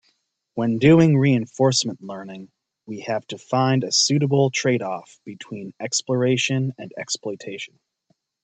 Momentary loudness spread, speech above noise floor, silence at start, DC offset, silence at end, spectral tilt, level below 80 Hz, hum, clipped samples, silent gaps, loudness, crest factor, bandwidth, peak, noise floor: 19 LU; 48 dB; 0.55 s; under 0.1%; 0.8 s; -5 dB/octave; -60 dBFS; none; under 0.1%; none; -20 LUFS; 20 dB; 9.2 kHz; -2 dBFS; -69 dBFS